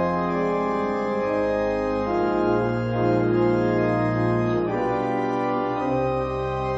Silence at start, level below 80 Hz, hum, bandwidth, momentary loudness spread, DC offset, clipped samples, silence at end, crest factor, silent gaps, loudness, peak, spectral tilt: 0 s; -44 dBFS; none; 8 kHz; 4 LU; under 0.1%; under 0.1%; 0 s; 12 dB; none; -23 LUFS; -10 dBFS; -8.5 dB/octave